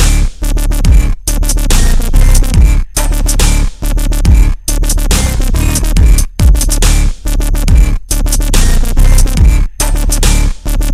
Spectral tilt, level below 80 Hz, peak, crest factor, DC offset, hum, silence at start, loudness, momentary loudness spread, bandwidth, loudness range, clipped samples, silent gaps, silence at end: -4 dB/octave; -8 dBFS; 0 dBFS; 8 dB; under 0.1%; none; 0 s; -12 LUFS; 5 LU; 16 kHz; 1 LU; 0.6%; none; 0 s